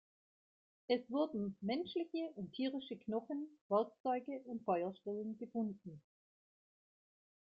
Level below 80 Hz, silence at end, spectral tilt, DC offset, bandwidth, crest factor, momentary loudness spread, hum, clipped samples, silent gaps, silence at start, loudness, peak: -84 dBFS; 1.45 s; -5 dB/octave; under 0.1%; 5.2 kHz; 20 dB; 8 LU; none; under 0.1%; 3.61-3.69 s, 4.00-4.04 s; 0.9 s; -41 LUFS; -22 dBFS